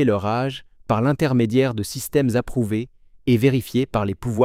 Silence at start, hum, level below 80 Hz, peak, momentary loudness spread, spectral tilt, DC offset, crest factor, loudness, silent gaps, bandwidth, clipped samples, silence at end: 0 s; none; -46 dBFS; -6 dBFS; 9 LU; -6.5 dB/octave; under 0.1%; 16 dB; -21 LUFS; none; 16 kHz; under 0.1%; 0 s